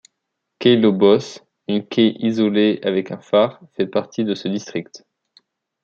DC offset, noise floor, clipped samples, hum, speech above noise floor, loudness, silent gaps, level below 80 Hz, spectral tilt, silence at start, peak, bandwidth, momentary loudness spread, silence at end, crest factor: under 0.1%; -78 dBFS; under 0.1%; none; 60 dB; -19 LUFS; none; -66 dBFS; -6.5 dB/octave; 0.6 s; -2 dBFS; 7.6 kHz; 11 LU; 0.85 s; 18 dB